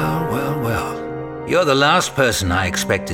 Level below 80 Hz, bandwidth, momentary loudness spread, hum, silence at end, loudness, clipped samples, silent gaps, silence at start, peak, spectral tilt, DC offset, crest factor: -40 dBFS; 18 kHz; 12 LU; none; 0 s; -18 LUFS; under 0.1%; none; 0 s; -2 dBFS; -4 dB/octave; under 0.1%; 16 dB